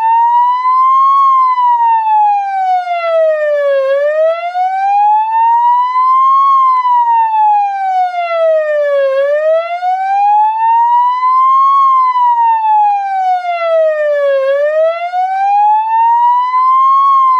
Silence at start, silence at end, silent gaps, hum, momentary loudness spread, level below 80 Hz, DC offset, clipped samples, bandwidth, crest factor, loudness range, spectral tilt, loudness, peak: 0 s; 0 s; none; none; 6 LU; -88 dBFS; under 0.1%; under 0.1%; 7.2 kHz; 6 dB; 2 LU; 1.5 dB/octave; -10 LUFS; -4 dBFS